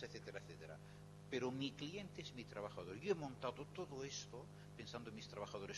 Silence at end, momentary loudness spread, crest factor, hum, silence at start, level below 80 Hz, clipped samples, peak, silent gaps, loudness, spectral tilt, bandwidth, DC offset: 0 s; 12 LU; 22 dB; 50 Hz at -65 dBFS; 0 s; -72 dBFS; under 0.1%; -28 dBFS; none; -49 LUFS; -4.5 dB/octave; 12 kHz; under 0.1%